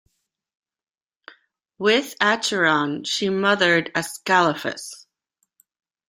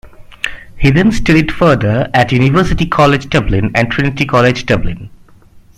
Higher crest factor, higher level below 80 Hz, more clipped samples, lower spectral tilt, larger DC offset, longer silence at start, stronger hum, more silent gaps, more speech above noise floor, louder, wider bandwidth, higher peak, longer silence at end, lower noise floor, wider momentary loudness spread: first, 22 dB vs 12 dB; second, -68 dBFS vs -26 dBFS; neither; second, -3.5 dB/octave vs -6.5 dB/octave; neither; first, 1.8 s vs 0.05 s; neither; neither; first, over 69 dB vs 30 dB; second, -20 LUFS vs -12 LUFS; first, 16 kHz vs 13.5 kHz; about the same, -2 dBFS vs 0 dBFS; first, 1.1 s vs 0.2 s; first, under -90 dBFS vs -41 dBFS; about the same, 10 LU vs 12 LU